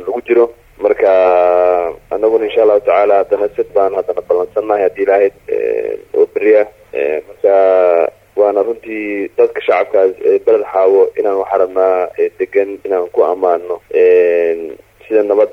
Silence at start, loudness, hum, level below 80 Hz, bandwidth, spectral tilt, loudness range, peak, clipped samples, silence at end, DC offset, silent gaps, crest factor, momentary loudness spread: 0 s; -13 LUFS; none; -52 dBFS; 4.8 kHz; -6.5 dB/octave; 2 LU; 0 dBFS; under 0.1%; 0 s; under 0.1%; none; 12 dB; 8 LU